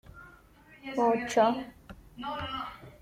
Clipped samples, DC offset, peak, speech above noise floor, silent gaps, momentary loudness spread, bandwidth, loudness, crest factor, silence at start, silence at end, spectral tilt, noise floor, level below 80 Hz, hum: under 0.1%; under 0.1%; -12 dBFS; 28 dB; none; 20 LU; 16 kHz; -30 LUFS; 20 dB; 0.15 s; 0.1 s; -4.5 dB/octave; -56 dBFS; -58 dBFS; none